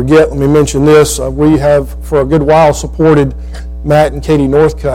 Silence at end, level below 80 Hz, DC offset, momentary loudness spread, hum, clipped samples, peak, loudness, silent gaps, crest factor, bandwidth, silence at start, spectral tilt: 0 s; -22 dBFS; under 0.1%; 7 LU; none; under 0.1%; 0 dBFS; -9 LUFS; none; 8 dB; 16 kHz; 0 s; -6.5 dB/octave